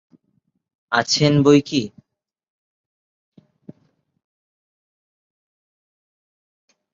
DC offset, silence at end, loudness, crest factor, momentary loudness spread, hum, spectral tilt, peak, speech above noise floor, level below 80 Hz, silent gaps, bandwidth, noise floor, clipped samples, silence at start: under 0.1%; 5.05 s; -17 LUFS; 22 dB; 10 LU; none; -5 dB/octave; -2 dBFS; 52 dB; -62 dBFS; none; 7.8 kHz; -69 dBFS; under 0.1%; 0.9 s